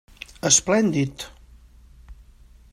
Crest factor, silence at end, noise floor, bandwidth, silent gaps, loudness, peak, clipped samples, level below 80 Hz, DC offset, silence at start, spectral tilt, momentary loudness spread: 22 dB; 0.6 s; -50 dBFS; 15 kHz; none; -20 LUFS; -2 dBFS; under 0.1%; -48 dBFS; under 0.1%; 0.45 s; -3 dB/octave; 22 LU